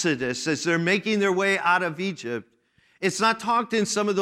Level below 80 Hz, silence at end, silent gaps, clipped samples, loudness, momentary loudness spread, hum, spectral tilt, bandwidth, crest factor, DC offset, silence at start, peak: -68 dBFS; 0 s; none; under 0.1%; -24 LUFS; 8 LU; none; -4 dB/octave; 15 kHz; 16 dB; under 0.1%; 0 s; -8 dBFS